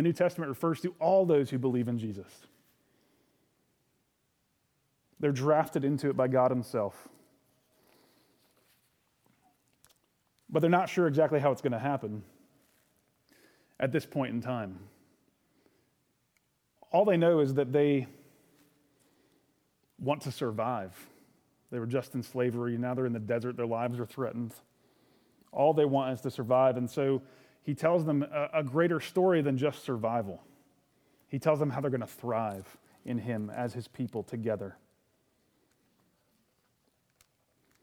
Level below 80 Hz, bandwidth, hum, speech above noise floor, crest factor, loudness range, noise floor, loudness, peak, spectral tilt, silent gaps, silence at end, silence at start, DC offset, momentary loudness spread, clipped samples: -78 dBFS; 18.5 kHz; none; 47 dB; 20 dB; 9 LU; -76 dBFS; -30 LUFS; -12 dBFS; -7.5 dB/octave; none; 3.1 s; 0 s; under 0.1%; 12 LU; under 0.1%